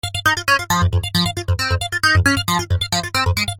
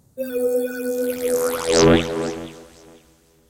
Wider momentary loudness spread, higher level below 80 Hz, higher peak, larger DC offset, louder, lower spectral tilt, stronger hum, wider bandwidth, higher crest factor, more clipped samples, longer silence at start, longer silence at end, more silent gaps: second, 5 LU vs 13 LU; first, -32 dBFS vs -40 dBFS; about the same, -2 dBFS vs -4 dBFS; neither; first, -17 LUFS vs -20 LUFS; about the same, -3.5 dB/octave vs -4.5 dB/octave; neither; about the same, 17 kHz vs 17 kHz; about the same, 16 dB vs 16 dB; neither; about the same, 0.05 s vs 0.15 s; second, 0 s vs 0.85 s; neither